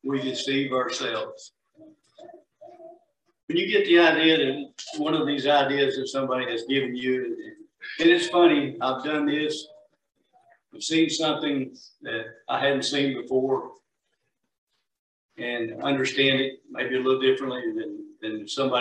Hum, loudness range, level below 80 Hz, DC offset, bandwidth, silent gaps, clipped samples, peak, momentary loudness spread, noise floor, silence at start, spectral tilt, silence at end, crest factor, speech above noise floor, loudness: none; 7 LU; -74 dBFS; under 0.1%; 9.8 kHz; 3.43-3.48 s, 14.58-14.67 s, 14.99-15.29 s; under 0.1%; -6 dBFS; 15 LU; -78 dBFS; 0.05 s; -4 dB/octave; 0 s; 20 dB; 54 dB; -24 LUFS